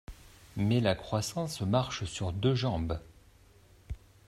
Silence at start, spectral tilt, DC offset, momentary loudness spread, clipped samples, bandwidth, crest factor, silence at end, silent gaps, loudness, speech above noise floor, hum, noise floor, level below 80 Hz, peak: 0.1 s; -6 dB/octave; under 0.1%; 18 LU; under 0.1%; 15.5 kHz; 20 dB; 0.3 s; none; -31 LUFS; 29 dB; none; -59 dBFS; -50 dBFS; -12 dBFS